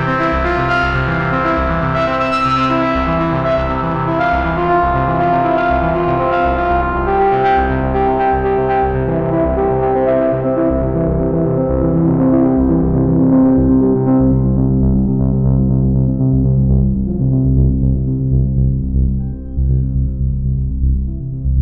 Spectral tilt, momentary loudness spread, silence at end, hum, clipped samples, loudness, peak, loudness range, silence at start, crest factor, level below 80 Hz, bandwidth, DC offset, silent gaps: -9.5 dB/octave; 5 LU; 0 s; none; under 0.1%; -15 LUFS; -2 dBFS; 3 LU; 0 s; 12 dB; -22 dBFS; 6 kHz; under 0.1%; none